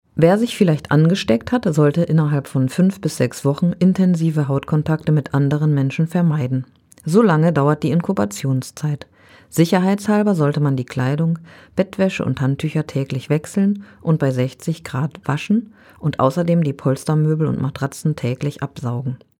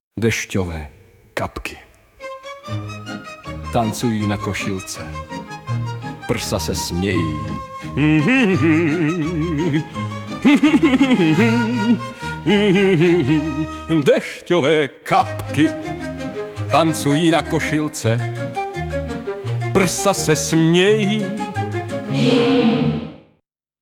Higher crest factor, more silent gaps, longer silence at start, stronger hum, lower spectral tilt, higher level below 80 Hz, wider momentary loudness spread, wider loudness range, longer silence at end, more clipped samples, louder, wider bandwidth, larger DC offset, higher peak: about the same, 18 dB vs 16 dB; neither; about the same, 0.15 s vs 0.15 s; neither; first, -7.5 dB/octave vs -5.5 dB/octave; second, -54 dBFS vs -44 dBFS; second, 9 LU vs 15 LU; second, 3 LU vs 8 LU; second, 0.25 s vs 0.65 s; neither; about the same, -19 LUFS vs -18 LUFS; second, 15.5 kHz vs 18 kHz; neither; first, 0 dBFS vs -4 dBFS